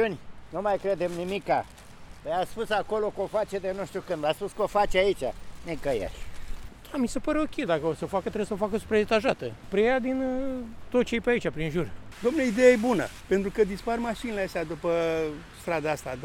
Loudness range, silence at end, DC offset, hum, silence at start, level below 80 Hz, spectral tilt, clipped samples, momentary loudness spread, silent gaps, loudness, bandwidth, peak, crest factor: 4 LU; 0 s; under 0.1%; none; 0 s; -46 dBFS; -5.5 dB/octave; under 0.1%; 11 LU; none; -28 LUFS; 16 kHz; -6 dBFS; 20 dB